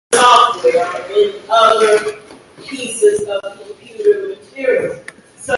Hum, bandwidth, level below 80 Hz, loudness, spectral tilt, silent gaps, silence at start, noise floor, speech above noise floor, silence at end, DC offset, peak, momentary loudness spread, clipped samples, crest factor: none; 11.5 kHz; -58 dBFS; -14 LUFS; -2 dB/octave; none; 0.1 s; -38 dBFS; 23 dB; 0 s; under 0.1%; 0 dBFS; 21 LU; under 0.1%; 14 dB